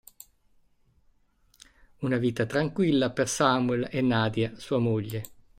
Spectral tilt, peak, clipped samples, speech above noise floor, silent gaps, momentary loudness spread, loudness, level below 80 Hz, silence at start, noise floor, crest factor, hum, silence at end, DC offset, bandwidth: -5.5 dB/octave; -6 dBFS; under 0.1%; 39 dB; none; 7 LU; -27 LUFS; -60 dBFS; 2 s; -65 dBFS; 22 dB; none; 0.25 s; under 0.1%; 16 kHz